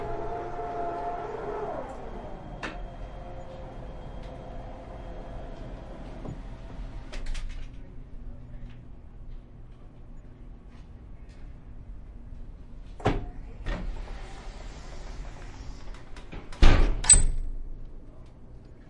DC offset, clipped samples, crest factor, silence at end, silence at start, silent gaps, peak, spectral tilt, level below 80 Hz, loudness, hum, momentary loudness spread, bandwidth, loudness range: under 0.1%; under 0.1%; 28 dB; 0 s; 0 s; none; -2 dBFS; -3 dB/octave; -32 dBFS; -29 LUFS; none; 19 LU; 11.5 kHz; 23 LU